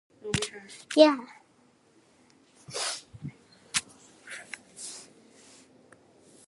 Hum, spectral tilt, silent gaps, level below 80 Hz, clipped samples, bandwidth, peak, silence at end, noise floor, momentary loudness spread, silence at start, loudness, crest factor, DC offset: none; -3.5 dB/octave; none; -62 dBFS; under 0.1%; 12 kHz; -4 dBFS; 1.45 s; -63 dBFS; 24 LU; 0.25 s; -28 LUFS; 28 dB; under 0.1%